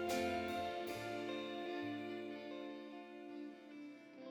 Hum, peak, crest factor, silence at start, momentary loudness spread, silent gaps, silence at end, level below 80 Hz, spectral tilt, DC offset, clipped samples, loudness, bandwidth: none; -28 dBFS; 16 dB; 0 s; 14 LU; none; 0 s; -76 dBFS; -4.5 dB/octave; under 0.1%; under 0.1%; -45 LUFS; over 20 kHz